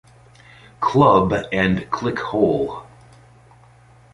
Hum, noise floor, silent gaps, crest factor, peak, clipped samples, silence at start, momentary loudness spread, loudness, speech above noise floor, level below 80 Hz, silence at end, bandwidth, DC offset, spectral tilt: none; -49 dBFS; none; 20 dB; -2 dBFS; under 0.1%; 0.8 s; 10 LU; -19 LUFS; 31 dB; -46 dBFS; 1.3 s; 11 kHz; under 0.1%; -7.5 dB/octave